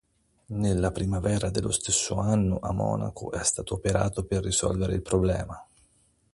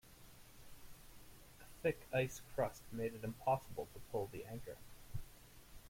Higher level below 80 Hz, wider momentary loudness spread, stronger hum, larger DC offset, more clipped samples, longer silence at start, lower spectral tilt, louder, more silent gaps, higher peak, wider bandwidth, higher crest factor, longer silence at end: first, -40 dBFS vs -60 dBFS; second, 6 LU vs 22 LU; neither; neither; neither; first, 0.5 s vs 0.05 s; about the same, -5 dB/octave vs -5.5 dB/octave; first, -27 LUFS vs -43 LUFS; neither; first, -8 dBFS vs -24 dBFS; second, 11.5 kHz vs 16.5 kHz; about the same, 18 dB vs 20 dB; first, 0.7 s vs 0 s